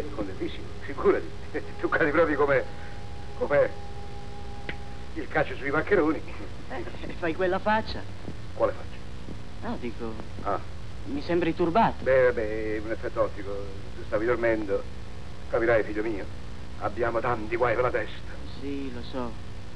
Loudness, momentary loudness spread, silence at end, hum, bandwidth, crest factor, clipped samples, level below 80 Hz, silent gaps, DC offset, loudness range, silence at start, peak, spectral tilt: -28 LUFS; 18 LU; 0 s; none; 11 kHz; 18 dB; under 0.1%; -44 dBFS; none; 2%; 4 LU; 0 s; -12 dBFS; -7 dB/octave